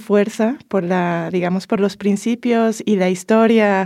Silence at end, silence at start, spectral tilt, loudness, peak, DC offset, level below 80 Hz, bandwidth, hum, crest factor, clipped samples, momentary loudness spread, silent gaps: 0 s; 0 s; -6.5 dB/octave; -17 LUFS; -4 dBFS; under 0.1%; -66 dBFS; 13.5 kHz; none; 14 dB; under 0.1%; 6 LU; none